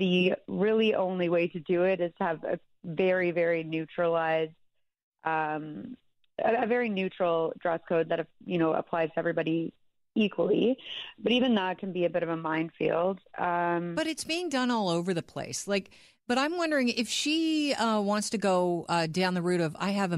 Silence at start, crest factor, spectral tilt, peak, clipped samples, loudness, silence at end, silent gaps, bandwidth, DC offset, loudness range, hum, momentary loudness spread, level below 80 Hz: 0 s; 16 dB; -5 dB/octave; -14 dBFS; under 0.1%; -29 LUFS; 0 s; 5.03-5.12 s; 13.5 kHz; under 0.1%; 3 LU; none; 7 LU; -70 dBFS